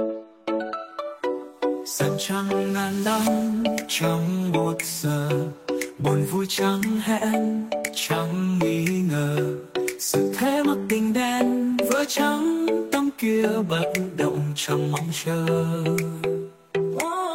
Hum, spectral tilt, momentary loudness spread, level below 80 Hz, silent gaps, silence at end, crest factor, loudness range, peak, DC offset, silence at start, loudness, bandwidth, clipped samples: none; -5 dB/octave; 6 LU; -62 dBFS; none; 0 s; 18 dB; 2 LU; -6 dBFS; under 0.1%; 0 s; -24 LUFS; 16.5 kHz; under 0.1%